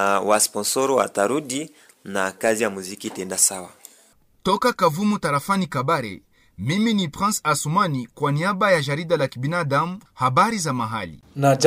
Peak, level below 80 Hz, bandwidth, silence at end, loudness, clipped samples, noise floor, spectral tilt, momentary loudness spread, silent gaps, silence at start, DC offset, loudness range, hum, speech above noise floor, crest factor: -2 dBFS; -58 dBFS; 16 kHz; 0 s; -22 LUFS; under 0.1%; -57 dBFS; -4 dB/octave; 12 LU; none; 0 s; under 0.1%; 2 LU; none; 35 dB; 20 dB